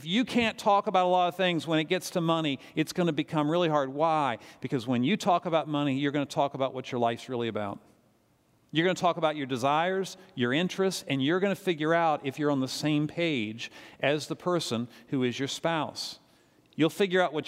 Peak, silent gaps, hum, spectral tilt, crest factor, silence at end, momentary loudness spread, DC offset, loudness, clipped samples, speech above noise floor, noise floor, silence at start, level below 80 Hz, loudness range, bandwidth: -10 dBFS; none; none; -5 dB/octave; 18 dB; 0 s; 8 LU; under 0.1%; -28 LUFS; under 0.1%; 39 dB; -67 dBFS; 0 s; -72 dBFS; 4 LU; 16 kHz